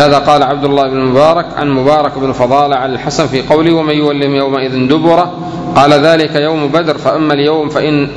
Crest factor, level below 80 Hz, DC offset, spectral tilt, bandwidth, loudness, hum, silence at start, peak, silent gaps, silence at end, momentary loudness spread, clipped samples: 10 dB; -40 dBFS; under 0.1%; -6 dB/octave; 11 kHz; -10 LUFS; none; 0 s; 0 dBFS; none; 0 s; 6 LU; 1%